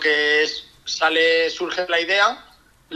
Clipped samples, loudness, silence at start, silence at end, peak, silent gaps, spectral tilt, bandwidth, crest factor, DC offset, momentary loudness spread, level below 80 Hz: under 0.1%; -19 LUFS; 0 s; 0 s; -6 dBFS; none; -1 dB/octave; 11.5 kHz; 16 dB; under 0.1%; 11 LU; -60 dBFS